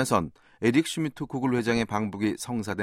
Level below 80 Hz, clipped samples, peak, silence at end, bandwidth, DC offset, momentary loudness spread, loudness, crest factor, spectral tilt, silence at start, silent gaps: -56 dBFS; under 0.1%; -8 dBFS; 0 s; 16 kHz; under 0.1%; 7 LU; -27 LUFS; 20 dB; -5.5 dB/octave; 0 s; none